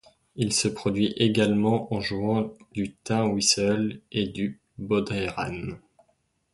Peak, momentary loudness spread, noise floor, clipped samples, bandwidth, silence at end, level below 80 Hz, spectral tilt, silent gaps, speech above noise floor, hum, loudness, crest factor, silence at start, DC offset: -8 dBFS; 11 LU; -70 dBFS; under 0.1%; 11.5 kHz; 0.75 s; -54 dBFS; -4.5 dB/octave; none; 45 dB; none; -26 LUFS; 20 dB; 0.35 s; under 0.1%